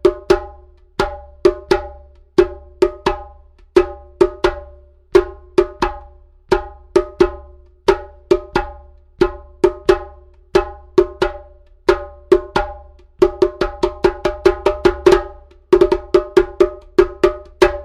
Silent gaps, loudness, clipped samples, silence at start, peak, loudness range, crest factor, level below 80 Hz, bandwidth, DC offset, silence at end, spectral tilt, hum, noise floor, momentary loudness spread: none; -17 LUFS; under 0.1%; 0.05 s; 0 dBFS; 4 LU; 18 dB; -32 dBFS; 11 kHz; under 0.1%; 0 s; -6 dB/octave; none; -43 dBFS; 8 LU